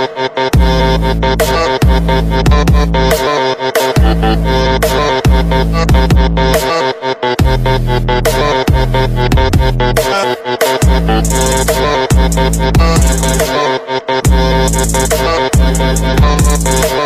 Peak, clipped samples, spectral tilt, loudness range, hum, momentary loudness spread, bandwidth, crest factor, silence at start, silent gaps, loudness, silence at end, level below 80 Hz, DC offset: 0 dBFS; under 0.1%; -5 dB/octave; 1 LU; none; 3 LU; 15.5 kHz; 10 dB; 0 s; none; -11 LUFS; 0 s; -14 dBFS; under 0.1%